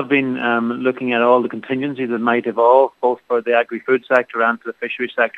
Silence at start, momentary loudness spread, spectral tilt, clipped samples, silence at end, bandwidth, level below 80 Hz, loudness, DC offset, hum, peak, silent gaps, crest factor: 0 s; 9 LU; -7 dB/octave; under 0.1%; 0 s; 5.4 kHz; -74 dBFS; -18 LUFS; under 0.1%; none; 0 dBFS; none; 18 dB